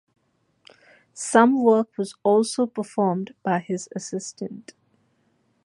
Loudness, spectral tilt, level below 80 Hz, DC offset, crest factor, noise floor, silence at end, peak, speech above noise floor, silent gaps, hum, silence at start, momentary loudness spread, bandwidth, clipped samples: -23 LUFS; -5 dB/octave; -76 dBFS; under 0.1%; 22 dB; -67 dBFS; 1.05 s; -2 dBFS; 45 dB; none; none; 1.15 s; 16 LU; 11.5 kHz; under 0.1%